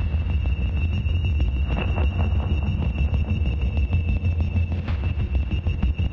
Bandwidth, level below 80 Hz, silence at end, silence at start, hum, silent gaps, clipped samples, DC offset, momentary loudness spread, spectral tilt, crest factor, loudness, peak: 5.8 kHz; -26 dBFS; 0 s; 0 s; none; none; under 0.1%; under 0.1%; 2 LU; -9 dB/octave; 12 dB; -24 LUFS; -10 dBFS